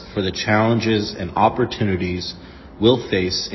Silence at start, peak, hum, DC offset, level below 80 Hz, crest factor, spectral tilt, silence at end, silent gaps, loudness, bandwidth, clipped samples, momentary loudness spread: 0 s; -2 dBFS; none; under 0.1%; -40 dBFS; 18 dB; -5.5 dB/octave; 0 s; none; -19 LUFS; 6.2 kHz; under 0.1%; 8 LU